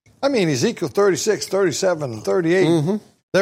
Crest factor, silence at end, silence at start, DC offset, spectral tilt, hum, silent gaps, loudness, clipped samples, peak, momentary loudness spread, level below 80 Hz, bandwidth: 14 dB; 0 s; 0.2 s; under 0.1%; -5 dB/octave; none; 3.23-3.32 s; -19 LUFS; under 0.1%; -6 dBFS; 6 LU; -62 dBFS; 16 kHz